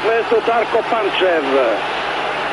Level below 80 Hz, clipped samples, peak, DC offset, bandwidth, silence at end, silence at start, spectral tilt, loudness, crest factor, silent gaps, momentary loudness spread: -52 dBFS; under 0.1%; -4 dBFS; under 0.1%; 10.5 kHz; 0 s; 0 s; -4 dB/octave; -17 LUFS; 12 dB; none; 5 LU